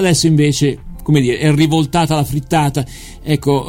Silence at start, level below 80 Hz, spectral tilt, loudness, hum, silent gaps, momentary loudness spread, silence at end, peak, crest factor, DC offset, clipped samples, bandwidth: 0 s; -34 dBFS; -5.5 dB/octave; -14 LUFS; none; none; 10 LU; 0 s; 0 dBFS; 14 dB; under 0.1%; under 0.1%; 16 kHz